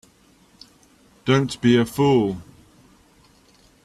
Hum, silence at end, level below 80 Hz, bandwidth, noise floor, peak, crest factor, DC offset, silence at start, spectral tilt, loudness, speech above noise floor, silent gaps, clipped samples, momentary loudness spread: none; 1.4 s; -56 dBFS; 14.5 kHz; -56 dBFS; -6 dBFS; 18 dB; under 0.1%; 1.25 s; -6.5 dB/octave; -20 LUFS; 37 dB; none; under 0.1%; 11 LU